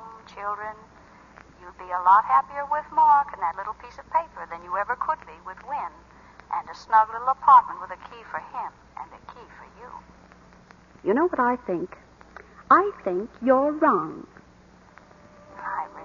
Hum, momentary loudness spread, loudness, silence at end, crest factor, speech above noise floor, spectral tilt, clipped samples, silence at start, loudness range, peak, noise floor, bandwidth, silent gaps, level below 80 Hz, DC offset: none; 23 LU; -23 LUFS; 0 s; 20 dB; 29 dB; -6.5 dB/octave; under 0.1%; 0 s; 8 LU; -6 dBFS; -53 dBFS; 7.2 kHz; none; -58 dBFS; under 0.1%